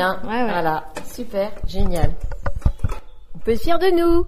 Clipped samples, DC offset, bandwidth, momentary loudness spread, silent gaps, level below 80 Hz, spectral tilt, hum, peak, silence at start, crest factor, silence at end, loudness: under 0.1%; under 0.1%; 14.5 kHz; 12 LU; none; -26 dBFS; -6.5 dB/octave; none; 0 dBFS; 0 s; 16 dB; 0 s; -23 LUFS